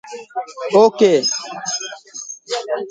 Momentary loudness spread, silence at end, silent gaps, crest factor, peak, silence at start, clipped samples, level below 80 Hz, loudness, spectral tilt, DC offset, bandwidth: 17 LU; 0 s; none; 18 dB; 0 dBFS; 0.05 s; under 0.1%; -72 dBFS; -17 LUFS; -3 dB/octave; under 0.1%; 9.4 kHz